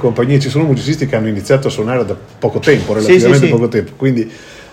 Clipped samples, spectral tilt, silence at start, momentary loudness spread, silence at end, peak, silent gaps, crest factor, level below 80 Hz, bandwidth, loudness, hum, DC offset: 0.5%; -6.5 dB/octave; 0 s; 9 LU; 0.05 s; 0 dBFS; none; 12 dB; -46 dBFS; 14 kHz; -13 LUFS; none; under 0.1%